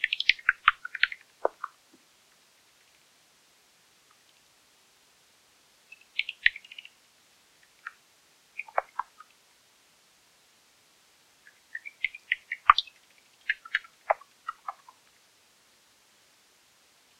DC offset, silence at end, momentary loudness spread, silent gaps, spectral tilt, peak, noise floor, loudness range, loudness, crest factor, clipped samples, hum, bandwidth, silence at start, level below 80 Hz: under 0.1%; 2.5 s; 22 LU; none; 0 dB/octave; 0 dBFS; -63 dBFS; 12 LU; -29 LUFS; 34 dB; under 0.1%; none; 16 kHz; 0 s; -66 dBFS